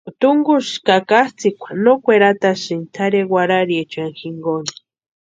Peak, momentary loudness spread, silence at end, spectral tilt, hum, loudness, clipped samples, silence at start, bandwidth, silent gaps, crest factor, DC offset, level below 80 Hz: 0 dBFS; 12 LU; 0.7 s; -5 dB/octave; none; -16 LUFS; under 0.1%; 0.05 s; 9 kHz; none; 16 dB; under 0.1%; -66 dBFS